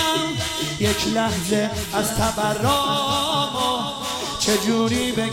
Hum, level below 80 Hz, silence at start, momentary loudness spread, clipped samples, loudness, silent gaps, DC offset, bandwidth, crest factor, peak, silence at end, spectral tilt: none; -42 dBFS; 0 s; 4 LU; under 0.1%; -21 LUFS; none; under 0.1%; 16.5 kHz; 14 dB; -6 dBFS; 0 s; -3.5 dB/octave